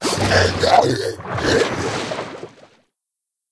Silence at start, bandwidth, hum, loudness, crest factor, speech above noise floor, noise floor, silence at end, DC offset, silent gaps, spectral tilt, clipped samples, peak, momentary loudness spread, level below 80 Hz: 0 s; 11 kHz; none; -18 LUFS; 20 dB; 65 dB; -82 dBFS; 1.05 s; under 0.1%; none; -4 dB/octave; under 0.1%; 0 dBFS; 13 LU; -42 dBFS